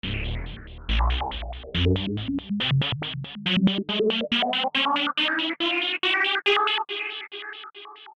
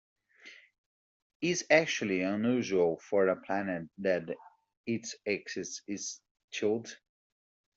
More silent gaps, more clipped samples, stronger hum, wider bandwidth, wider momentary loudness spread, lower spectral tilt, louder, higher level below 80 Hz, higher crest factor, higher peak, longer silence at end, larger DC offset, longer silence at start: second, none vs 0.78-1.40 s, 4.77-4.84 s, 6.31-6.35 s, 6.44-6.48 s; neither; neither; first, 9 kHz vs 8 kHz; second, 14 LU vs 18 LU; first, -6 dB/octave vs -4 dB/octave; first, -24 LUFS vs -32 LUFS; first, -36 dBFS vs -76 dBFS; second, 16 dB vs 24 dB; about the same, -10 dBFS vs -10 dBFS; second, 0 s vs 0.8 s; neither; second, 0.05 s vs 0.45 s